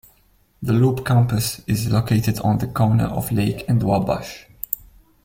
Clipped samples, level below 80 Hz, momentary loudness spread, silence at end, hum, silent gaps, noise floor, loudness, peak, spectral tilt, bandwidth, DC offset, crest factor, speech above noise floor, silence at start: under 0.1%; -44 dBFS; 10 LU; 0.5 s; none; none; -58 dBFS; -20 LUFS; -2 dBFS; -6.5 dB/octave; 16.5 kHz; under 0.1%; 18 dB; 39 dB; 0.6 s